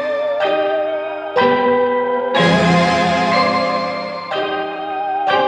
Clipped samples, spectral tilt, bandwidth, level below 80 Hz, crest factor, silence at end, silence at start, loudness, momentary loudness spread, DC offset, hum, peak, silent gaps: under 0.1%; -5.5 dB/octave; 10 kHz; -52 dBFS; 14 dB; 0 s; 0 s; -16 LUFS; 9 LU; under 0.1%; none; -2 dBFS; none